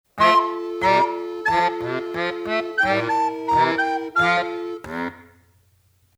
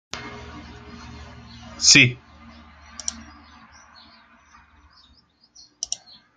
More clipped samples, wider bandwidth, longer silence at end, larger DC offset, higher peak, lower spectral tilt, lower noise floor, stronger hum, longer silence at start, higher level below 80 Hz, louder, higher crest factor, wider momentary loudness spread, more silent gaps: neither; first, 15 kHz vs 11 kHz; first, 0.95 s vs 0.5 s; neither; second, -4 dBFS vs 0 dBFS; first, -5 dB/octave vs -1.5 dB/octave; about the same, -61 dBFS vs -58 dBFS; neither; about the same, 0.15 s vs 0.15 s; about the same, -56 dBFS vs -52 dBFS; second, -21 LUFS vs -17 LUFS; second, 18 dB vs 26 dB; second, 12 LU vs 30 LU; neither